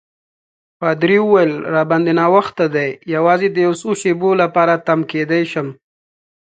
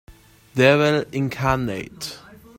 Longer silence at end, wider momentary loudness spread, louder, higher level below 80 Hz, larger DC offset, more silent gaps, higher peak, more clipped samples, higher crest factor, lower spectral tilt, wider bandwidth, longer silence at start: first, 0.85 s vs 0.4 s; second, 7 LU vs 17 LU; first, -15 LUFS vs -20 LUFS; second, -64 dBFS vs -46 dBFS; neither; neither; about the same, 0 dBFS vs -2 dBFS; neither; about the same, 16 dB vs 20 dB; about the same, -6.5 dB/octave vs -5.5 dB/octave; second, 9.2 kHz vs 16.5 kHz; first, 0.8 s vs 0.1 s